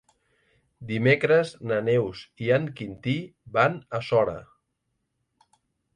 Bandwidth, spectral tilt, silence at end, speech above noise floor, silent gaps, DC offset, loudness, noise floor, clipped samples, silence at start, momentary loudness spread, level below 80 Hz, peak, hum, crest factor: 10 kHz; -7 dB/octave; 1.5 s; 53 dB; none; under 0.1%; -25 LUFS; -78 dBFS; under 0.1%; 0.8 s; 12 LU; -62 dBFS; -8 dBFS; none; 20 dB